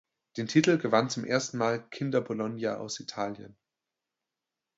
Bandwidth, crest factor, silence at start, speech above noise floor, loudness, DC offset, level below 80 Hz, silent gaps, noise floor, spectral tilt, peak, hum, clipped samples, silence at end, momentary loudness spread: 8 kHz; 24 dB; 0.35 s; 59 dB; -29 LUFS; under 0.1%; -74 dBFS; none; -88 dBFS; -5 dB/octave; -8 dBFS; none; under 0.1%; 1.25 s; 12 LU